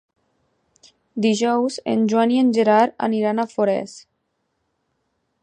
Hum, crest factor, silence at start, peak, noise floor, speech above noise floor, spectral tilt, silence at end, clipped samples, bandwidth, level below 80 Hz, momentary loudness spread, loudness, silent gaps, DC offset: none; 18 dB; 1.15 s; -4 dBFS; -72 dBFS; 54 dB; -5.5 dB/octave; 1.4 s; under 0.1%; 9.6 kHz; -72 dBFS; 7 LU; -19 LUFS; none; under 0.1%